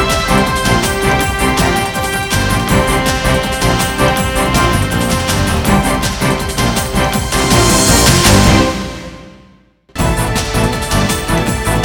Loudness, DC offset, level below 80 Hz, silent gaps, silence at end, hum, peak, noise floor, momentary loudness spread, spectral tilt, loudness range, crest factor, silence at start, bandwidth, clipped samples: -12 LUFS; under 0.1%; -22 dBFS; none; 0 s; none; 0 dBFS; -46 dBFS; 7 LU; -4 dB/octave; 3 LU; 12 dB; 0 s; 18 kHz; under 0.1%